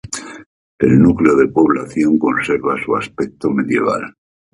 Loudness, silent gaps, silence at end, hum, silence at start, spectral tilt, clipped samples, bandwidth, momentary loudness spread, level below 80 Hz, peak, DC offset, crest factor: -15 LUFS; 0.46-0.78 s; 0.45 s; none; 0.05 s; -7 dB/octave; under 0.1%; 11.5 kHz; 13 LU; -44 dBFS; 0 dBFS; under 0.1%; 16 dB